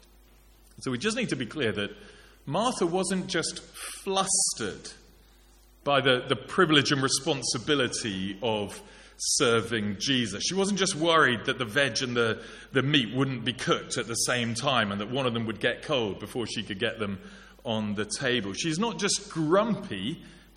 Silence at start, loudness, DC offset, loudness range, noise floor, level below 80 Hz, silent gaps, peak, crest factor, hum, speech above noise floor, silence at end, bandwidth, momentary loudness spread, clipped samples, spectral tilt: 0.8 s; -27 LUFS; under 0.1%; 5 LU; -57 dBFS; -58 dBFS; none; -6 dBFS; 24 dB; none; 29 dB; 0.15 s; 14.5 kHz; 11 LU; under 0.1%; -3.5 dB/octave